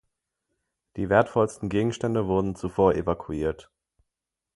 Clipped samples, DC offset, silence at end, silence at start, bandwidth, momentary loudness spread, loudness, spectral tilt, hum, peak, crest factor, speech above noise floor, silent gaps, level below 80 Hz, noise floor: under 0.1%; under 0.1%; 0.95 s; 0.95 s; 11.5 kHz; 9 LU; -25 LUFS; -7 dB/octave; none; -4 dBFS; 22 dB; 62 dB; none; -48 dBFS; -86 dBFS